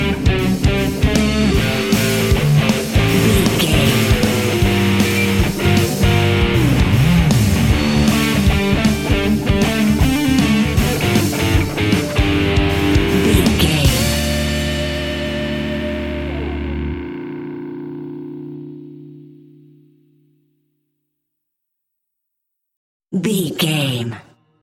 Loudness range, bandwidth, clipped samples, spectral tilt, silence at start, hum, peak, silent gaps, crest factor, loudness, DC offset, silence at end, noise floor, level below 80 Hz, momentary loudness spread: 13 LU; 17 kHz; under 0.1%; -5.5 dB/octave; 0 s; none; 0 dBFS; 22.77-23.00 s; 16 dB; -16 LUFS; under 0.1%; 0.4 s; -77 dBFS; -26 dBFS; 13 LU